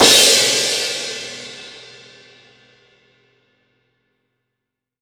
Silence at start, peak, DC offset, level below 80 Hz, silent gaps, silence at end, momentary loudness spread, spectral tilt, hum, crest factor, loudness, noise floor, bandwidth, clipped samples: 0 s; 0 dBFS; under 0.1%; -60 dBFS; none; 3.25 s; 26 LU; 0 dB/octave; 50 Hz at -85 dBFS; 20 dB; -13 LUFS; -81 dBFS; over 20 kHz; under 0.1%